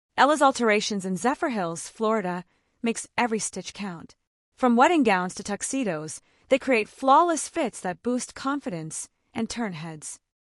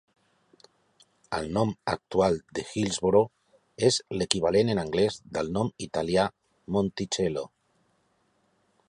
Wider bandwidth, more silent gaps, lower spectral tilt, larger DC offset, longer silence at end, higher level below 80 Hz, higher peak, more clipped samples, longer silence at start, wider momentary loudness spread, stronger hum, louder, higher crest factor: about the same, 12 kHz vs 11.5 kHz; first, 4.27-4.52 s vs none; about the same, -4 dB/octave vs -5 dB/octave; neither; second, 0.35 s vs 1.4 s; second, -66 dBFS vs -54 dBFS; second, -6 dBFS vs 0 dBFS; neither; second, 0.15 s vs 1.3 s; first, 17 LU vs 9 LU; neither; about the same, -25 LUFS vs -27 LUFS; second, 18 dB vs 28 dB